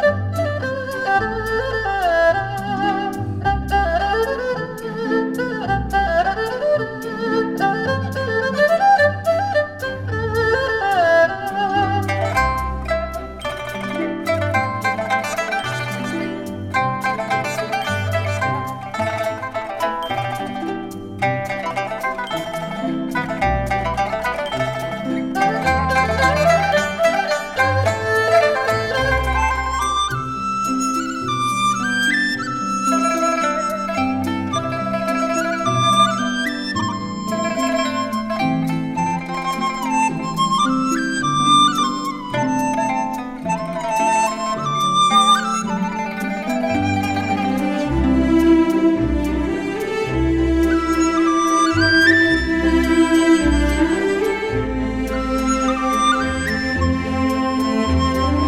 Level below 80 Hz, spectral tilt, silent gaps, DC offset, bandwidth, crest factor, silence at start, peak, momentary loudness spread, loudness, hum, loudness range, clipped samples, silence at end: -34 dBFS; -5 dB/octave; none; under 0.1%; 16.5 kHz; 18 dB; 0 s; -2 dBFS; 9 LU; -19 LUFS; none; 6 LU; under 0.1%; 0 s